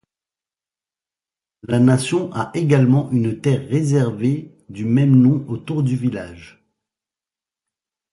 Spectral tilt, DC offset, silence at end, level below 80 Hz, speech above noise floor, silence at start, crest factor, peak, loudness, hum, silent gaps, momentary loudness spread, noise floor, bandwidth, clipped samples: -7.5 dB/octave; under 0.1%; 1.65 s; -54 dBFS; over 73 dB; 1.65 s; 16 dB; -2 dBFS; -18 LUFS; none; none; 11 LU; under -90 dBFS; 11.5 kHz; under 0.1%